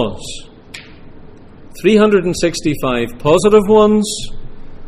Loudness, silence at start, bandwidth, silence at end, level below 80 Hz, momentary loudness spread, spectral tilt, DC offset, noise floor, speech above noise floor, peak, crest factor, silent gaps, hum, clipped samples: -13 LUFS; 0 s; 15.5 kHz; 0 s; -34 dBFS; 23 LU; -5 dB/octave; under 0.1%; -36 dBFS; 23 dB; 0 dBFS; 14 dB; none; none; under 0.1%